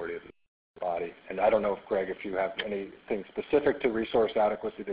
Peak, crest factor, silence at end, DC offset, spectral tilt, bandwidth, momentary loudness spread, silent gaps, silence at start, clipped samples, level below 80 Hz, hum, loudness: -12 dBFS; 18 dB; 0 s; under 0.1%; -9 dB/octave; 5 kHz; 11 LU; 0.48-0.74 s; 0 s; under 0.1%; -60 dBFS; none; -30 LUFS